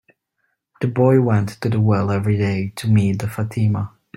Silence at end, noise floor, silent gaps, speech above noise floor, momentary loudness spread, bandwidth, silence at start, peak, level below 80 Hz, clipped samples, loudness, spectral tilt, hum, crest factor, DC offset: 0.3 s; -72 dBFS; none; 54 dB; 8 LU; 13 kHz; 0.8 s; -2 dBFS; -52 dBFS; under 0.1%; -19 LUFS; -8 dB/octave; none; 16 dB; under 0.1%